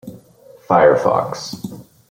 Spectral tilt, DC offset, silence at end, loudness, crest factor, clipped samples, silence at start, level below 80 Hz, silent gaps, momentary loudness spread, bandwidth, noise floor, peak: -5.5 dB/octave; under 0.1%; 0.3 s; -16 LUFS; 16 dB; under 0.1%; 0.05 s; -56 dBFS; none; 18 LU; 16 kHz; -46 dBFS; -2 dBFS